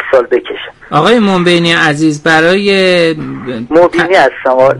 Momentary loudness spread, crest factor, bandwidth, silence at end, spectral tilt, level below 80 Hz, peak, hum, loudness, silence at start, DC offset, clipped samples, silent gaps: 10 LU; 10 dB; 11.5 kHz; 0 s; -5 dB/octave; -44 dBFS; 0 dBFS; none; -9 LUFS; 0 s; under 0.1%; 0.4%; none